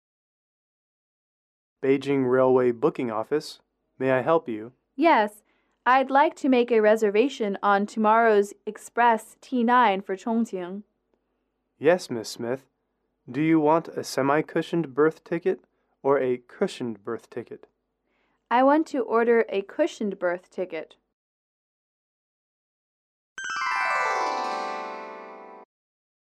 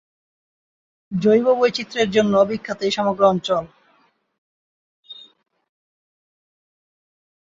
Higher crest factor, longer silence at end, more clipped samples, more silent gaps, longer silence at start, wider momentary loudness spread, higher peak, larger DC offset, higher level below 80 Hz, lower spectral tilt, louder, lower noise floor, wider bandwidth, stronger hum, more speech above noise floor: about the same, 18 dB vs 20 dB; second, 0.8 s vs 2.35 s; neither; first, 21.13-23.36 s vs 4.38-5.03 s; first, 1.8 s vs 1.1 s; about the same, 15 LU vs 13 LU; second, -8 dBFS vs -2 dBFS; neither; second, -76 dBFS vs -62 dBFS; about the same, -5.5 dB/octave vs -5.5 dB/octave; second, -24 LUFS vs -19 LUFS; first, -76 dBFS vs -61 dBFS; first, 13.5 kHz vs 7.8 kHz; neither; first, 53 dB vs 43 dB